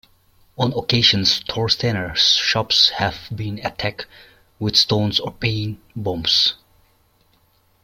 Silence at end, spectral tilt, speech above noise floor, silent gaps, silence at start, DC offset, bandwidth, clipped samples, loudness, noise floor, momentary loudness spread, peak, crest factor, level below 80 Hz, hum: 1.3 s; -3.5 dB/octave; 40 dB; none; 0.6 s; under 0.1%; 16.5 kHz; under 0.1%; -18 LUFS; -60 dBFS; 14 LU; -2 dBFS; 20 dB; -48 dBFS; none